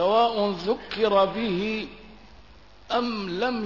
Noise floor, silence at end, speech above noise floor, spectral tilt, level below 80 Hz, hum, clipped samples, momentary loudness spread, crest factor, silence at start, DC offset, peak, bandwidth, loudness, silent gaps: -51 dBFS; 0 s; 27 dB; -6 dB/octave; -54 dBFS; none; under 0.1%; 8 LU; 16 dB; 0 s; 0.2%; -10 dBFS; 6 kHz; -25 LUFS; none